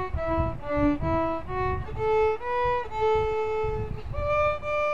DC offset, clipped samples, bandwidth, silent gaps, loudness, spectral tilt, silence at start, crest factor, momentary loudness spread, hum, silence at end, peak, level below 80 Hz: 1%; under 0.1%; 7.4 kHz; none; -27 LUFS; -8 dB/octave; 0 s; 14 dB; 5 LU; none; 0 s; -12 dBFS; -38 dBFS